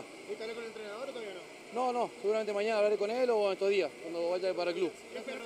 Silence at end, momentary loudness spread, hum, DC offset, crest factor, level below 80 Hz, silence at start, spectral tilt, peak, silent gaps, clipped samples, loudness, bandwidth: 0 s; 13 LU; none; under 0.1%; 16 dB; -82 dBFS; 0 s; -4 dB/octave; -18 dBFS; none; under 0.1%; -33 LUFS; 13 kHz